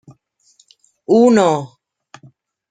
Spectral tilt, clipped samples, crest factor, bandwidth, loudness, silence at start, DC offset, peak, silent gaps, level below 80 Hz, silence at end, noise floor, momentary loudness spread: -6 dB/octave; under 0.1%; 16 dB; 9.4 kHz; -14 LUFS; 1.1 s; under 0.1%; -2 dBFS; none; -62 dBFS; 1.05 s; -56 dBFS; 24 LU